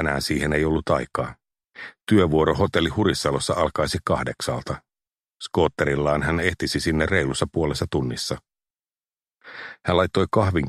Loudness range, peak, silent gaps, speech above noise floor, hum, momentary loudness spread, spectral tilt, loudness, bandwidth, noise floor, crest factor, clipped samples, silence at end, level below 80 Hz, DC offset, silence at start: 3 LU; -4 dBFS; none; over 68 dB; none; 14 LU; -5.5 dB/octave; -23 LUFS; 13.5 kHz; under -90 dBFS; 20 dB; under 0.1%; 0 s; -40 dBFS; under 0.1%; 0 s